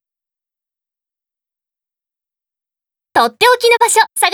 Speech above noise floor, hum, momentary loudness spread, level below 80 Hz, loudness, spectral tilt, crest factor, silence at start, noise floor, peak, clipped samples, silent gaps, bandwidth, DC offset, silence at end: 77 dB; none; 5 LU; -64 dBFS; -11 LUFS; 0.5 dB/octave; 18 dB; 3.15 s; -88 dBFS; 0 dBFS; under 0.1%; none; over 20 kHz; under 0.1%; 0 s